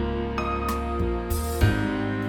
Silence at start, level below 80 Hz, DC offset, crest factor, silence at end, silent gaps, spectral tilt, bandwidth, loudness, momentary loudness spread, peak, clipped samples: 0 s; -30 dBFS; under 0.1%; 18 dB; 0 s; none; -6.5 dB/octave; 20 kHz; -26 LUFS; 5 LU; -8 dBFS; under 0.1%